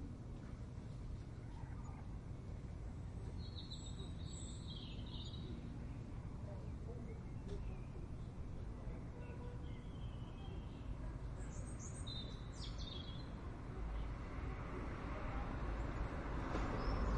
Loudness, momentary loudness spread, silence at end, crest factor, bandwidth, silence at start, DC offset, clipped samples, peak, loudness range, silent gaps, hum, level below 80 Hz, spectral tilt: -49 LUFS; 6 LU; 0 s; 16 dB; 10.5 kHz; 0 s; under 0.1%; under 0.1%; -30 dBFS; 4 LU; none; none; -50 dBFS; -6 dB/octave